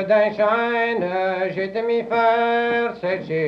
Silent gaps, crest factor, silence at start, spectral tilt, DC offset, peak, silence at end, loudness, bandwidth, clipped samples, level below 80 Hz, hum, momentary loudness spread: none; 14 dB; 0 s; -7 dB/octave; under 0.1%; -6 dBFS; 0 s; -20 LUFS; 6.6 kHz; under 0.1%; -62 dBFS; none; 6 LU